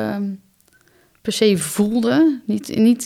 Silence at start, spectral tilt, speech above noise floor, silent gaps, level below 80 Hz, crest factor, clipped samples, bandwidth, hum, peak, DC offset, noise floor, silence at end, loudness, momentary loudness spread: 0 s; -5 dB/octave; 39 dB; none; -58 dBFS; 16 dB; under 0.1%; 16 kHz; none; -4 dBFS; under 0.1%; -56 dBFS; 0 s; -18 LUFS; 12 LU